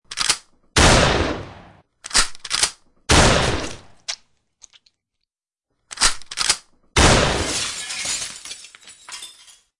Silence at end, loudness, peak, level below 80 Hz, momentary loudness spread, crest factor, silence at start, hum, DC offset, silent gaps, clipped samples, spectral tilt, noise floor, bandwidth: 0.5 s; -18 LUFS; -2 dBFS; -32 dBFS; 21 LU; 20 dB; 0.1 s; none; under 0.1%; none; under 0.1%; -2.5 dB/octave; -81 dBFS; 11.5 kHz